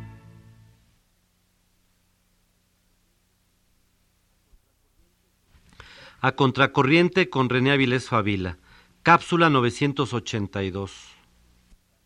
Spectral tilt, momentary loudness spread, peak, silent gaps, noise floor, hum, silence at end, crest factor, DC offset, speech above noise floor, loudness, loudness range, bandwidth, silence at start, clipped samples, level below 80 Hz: -6 dB/octave; 18 LU; -2 dBFS; none; -67 dBFS; 60 Hz at -70 dBFS; 1.05 s; 24 dB; under 0.1%; 45 dB; -22 LUFS; 6 LU; 11.5 kHz; 0 s; under 0.1%; -58 dBFS